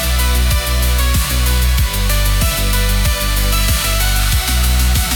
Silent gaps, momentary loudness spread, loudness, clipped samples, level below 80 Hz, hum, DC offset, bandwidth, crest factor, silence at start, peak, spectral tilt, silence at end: none; 1 LU; -15 LUFS; under 0.1%; -16 dBFS; none; under 0.1%; 19 kHz; 10 dB; 0 s; -4 dBFS; -3 dB/octave; 0 s